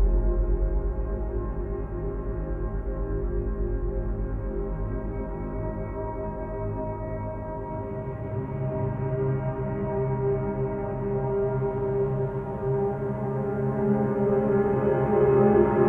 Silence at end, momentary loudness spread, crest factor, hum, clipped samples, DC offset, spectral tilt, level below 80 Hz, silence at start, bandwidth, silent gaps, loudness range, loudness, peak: 0 s; 9 LU; 18 dB; none; under 0.1%; under 0.1%; -12 dB/octave; -32 dBFS; 0 s; 3.2 kHz; none; 7 LU; -28 LUFS; -8 dBFS